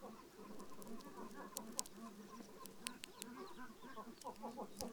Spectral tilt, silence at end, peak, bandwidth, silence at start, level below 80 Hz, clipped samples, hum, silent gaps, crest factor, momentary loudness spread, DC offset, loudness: -2.5 dB/octave; 0 s; -14 dBFS; over 20 kHz; 0 s; -74 dBFS; under 0.1%; none; none; 38 dB; 10 LU; under 0.1%; -52 LUFS